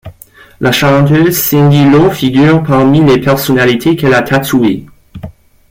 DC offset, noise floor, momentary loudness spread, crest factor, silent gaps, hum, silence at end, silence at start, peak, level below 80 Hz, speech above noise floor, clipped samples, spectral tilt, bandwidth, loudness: under 0.1%; -38 dBFS; 7 LU; 8 dB; none; none; 0.4 s; 0.05 s; 0 dBFS; -38 dBFS; 30 dB; under 0.1%; -6 dB/octave; 17 kHz; -8 LUFS